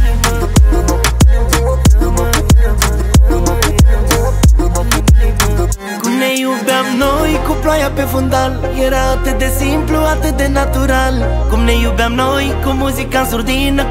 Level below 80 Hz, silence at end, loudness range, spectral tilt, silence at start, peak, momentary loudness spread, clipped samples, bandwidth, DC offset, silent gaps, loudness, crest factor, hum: -14 dBFS; 0 s; 2 LU; -5 dB/octave; 0 s; 0 dBFS; 4 LU; under 0.1%; 16.5 kHz; under 0.1%; none; -13 LUFS; 12 dB; none